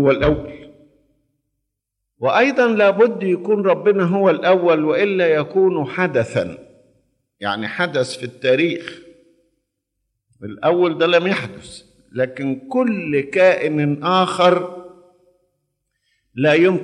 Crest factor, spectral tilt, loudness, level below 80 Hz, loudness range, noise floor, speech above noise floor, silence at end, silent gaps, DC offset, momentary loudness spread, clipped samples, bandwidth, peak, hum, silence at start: 16 dB; -6.5 dB/octave; -17 LUFS; -48 dBFS; 7 LU; -78 dBFS; 61 dB; 0 s; none; under 0.1%; 14 LU; under 0.1%; 11 kHz; -2 dBFS; none; 0 s